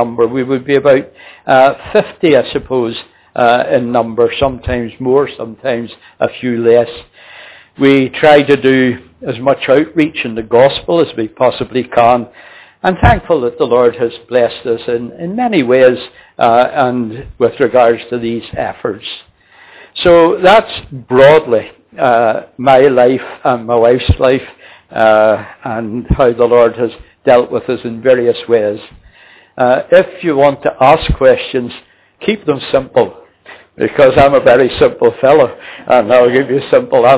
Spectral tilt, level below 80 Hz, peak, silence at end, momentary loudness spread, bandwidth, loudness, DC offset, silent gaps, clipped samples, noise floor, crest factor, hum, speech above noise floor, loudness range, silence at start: -10 dB/octave; -32 dBFS; 0 dBFS; 0 s; 12 LU; 4 kHz; -11 LUFS; under 0.1%; none; 0.2%; -42 dBFS; 12 dB; none; 32 dB; 4 LU; 0 s